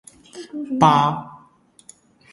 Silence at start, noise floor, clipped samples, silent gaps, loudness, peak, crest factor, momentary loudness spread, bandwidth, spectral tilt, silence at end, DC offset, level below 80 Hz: 0.35 s; -53 dBFS; under 0.1%; none; -18 LUFS; 0 dBFS; 22 dB; 26 LU; 11.5 kHz; -6 dB/octave; 0.95 s; under 0.1%; -60 dBFS